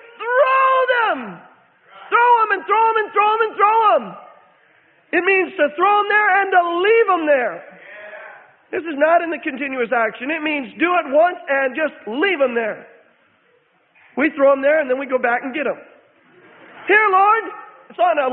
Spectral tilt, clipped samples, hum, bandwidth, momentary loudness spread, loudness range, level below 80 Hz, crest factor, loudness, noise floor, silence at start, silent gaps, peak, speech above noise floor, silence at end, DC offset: -8.5 dB/octave; under 0.1%; none; 4.4 kHz; 15 LU; 4 LU; -72 dBFS; 16 dB; -17 LUFS; -59 dBFS; 0.2 s; none; -2 dBFS; 42 dB; 0 s; under 0.1%